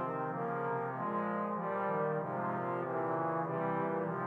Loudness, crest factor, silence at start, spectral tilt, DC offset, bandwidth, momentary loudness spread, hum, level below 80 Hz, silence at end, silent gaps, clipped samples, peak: -36 LUFS; 12 dB; 0 s; -10 dB/octave; under 0.1%; 4.4 kHz; 2 LU; none; -86 dBFS; 0 s; none; under 0.1%; -22 dBFS